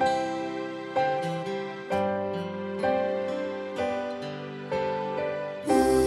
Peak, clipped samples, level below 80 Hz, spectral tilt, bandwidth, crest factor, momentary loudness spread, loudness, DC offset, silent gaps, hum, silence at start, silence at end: -10 dBFS; under 0.1%; -54 dBFS; -5.5 dB/octave; 15.5 kHz; 18 dB; 7 LU; -29 LUFS; under 0.1%; none; none; 0 s; 0 s